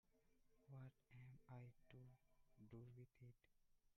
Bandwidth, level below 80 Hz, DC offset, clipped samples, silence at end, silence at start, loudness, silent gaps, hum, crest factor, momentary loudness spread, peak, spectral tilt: 5.8 kHz; -82 dBFS; under 0.1%; under 0.1%; 0.05 s; 0.05 s; -65 LUFS; none; none; 16 dB; 5 LU; -50 dBFS; -8 dB/octave